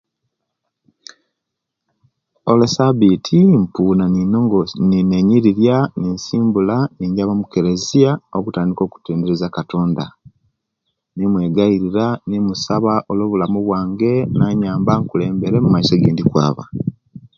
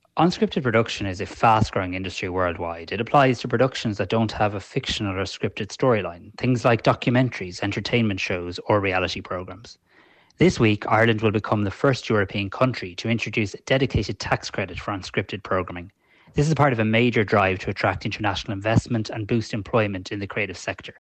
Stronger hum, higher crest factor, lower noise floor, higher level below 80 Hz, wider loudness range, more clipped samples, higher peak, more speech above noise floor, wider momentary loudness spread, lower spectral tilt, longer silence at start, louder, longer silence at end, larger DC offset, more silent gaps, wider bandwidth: neither; about the same, 16 dB vs 18 dB; first, -79 dBFS vs -56 dBFS; about the same, -46 dBFS vs -46 dBFS; about the same, 5 LU vs 3 LU; neither; first, 0 dBFS vs -6 dBFS; first, 64 dB vs 33 dB; about the same, 8 LU vs 10 LU; first, -7.5 dB/octave vs -6 dB/octave; first, 2.45 s vs 0.15 s; first, -16 LUFS vs -23 LUFS; about the same, 0.2 s vs 0.1 s; neither; neither; second, 7.4 kHz vs 8.8 kHz